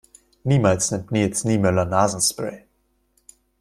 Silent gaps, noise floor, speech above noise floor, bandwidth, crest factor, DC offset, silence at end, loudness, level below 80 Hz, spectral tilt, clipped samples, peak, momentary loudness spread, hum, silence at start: none; -67 dBFS; 47 dB; 14.5 kHz; 20 dB; under 0.1%; 1.05 s; -21 LUFS; -52 dBFS; -5 dB/octave; under 0.1%; -2 dBFS; 10 LU; none; 0.45 s